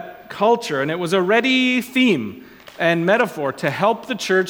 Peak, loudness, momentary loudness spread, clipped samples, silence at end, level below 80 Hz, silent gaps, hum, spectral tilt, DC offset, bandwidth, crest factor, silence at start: -2 dBFS; -18 LUFS; 7 LU; under 0.1%; 0 s; -64 dBFS; none; none; -5 dB/octave; under 0.1%; 19 kHz; 16 dB; 0 s